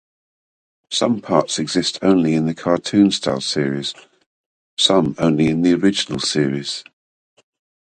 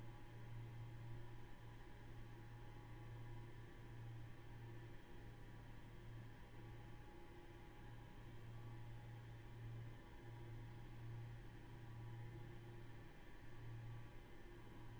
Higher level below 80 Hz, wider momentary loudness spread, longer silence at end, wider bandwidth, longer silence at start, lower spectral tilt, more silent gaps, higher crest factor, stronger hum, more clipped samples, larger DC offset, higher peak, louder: first, -52 dBFS vs -62 dBFS; first, 9 LU vs 5 LU; first, 1 s vs 0 s; second, 9.6 kHz vs over 20 kHz; first, 0.9 s vs 0 s; second, -4.5 dB/octave vs -7 dB/octave; first, 4.26-4.77 s vs none; first, 18 dB vs 12 dB; neither; neither; neither; first, 0 dBFS vs -42 dBFS; first, -18 LUFS vs -58 LUFS